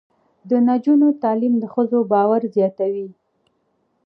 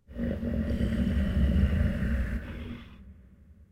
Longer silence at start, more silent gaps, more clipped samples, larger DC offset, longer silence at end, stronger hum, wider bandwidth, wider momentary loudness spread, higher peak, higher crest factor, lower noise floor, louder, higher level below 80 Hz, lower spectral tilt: first, 0.45 s vs 0.1 s; neither; neither; neither; first, 0.95 s vs 0.1 s; neither; second, 4.6 kHz vs 8.8 kHz; second, 8 LU vs 15 LU; first, -4 dBFS vs -14 dBFS; about the same, 14 dB vs 16 dB; first, -67 dBFS vs -54 dBFS; first, -18 LUFS vs -29 LUFS; second, -78 dBFS vs -32 dBFS; first, -10.5 dB/octave vs -8.5 dB/octave